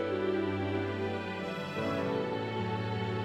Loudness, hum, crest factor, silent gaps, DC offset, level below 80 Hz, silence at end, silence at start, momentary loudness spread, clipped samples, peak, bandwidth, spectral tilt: -34 LUFS; none; 12 dB; none; under 0.1%; -66 dBFS; 0 s; 0 s; 4 LU; under 0.1%; -20 dBFS; 14 kHz; -7 dB/octave